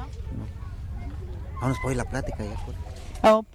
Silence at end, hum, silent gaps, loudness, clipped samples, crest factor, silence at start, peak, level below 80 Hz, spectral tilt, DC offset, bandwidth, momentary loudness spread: 0 s; none; none; -29 LUFS; under 0.1%; 20 dB; 0 s; -6 dBFS; -36 dBFS; -6.5 dB/octave; under 0.1%; 15.5 kHz; 16 LU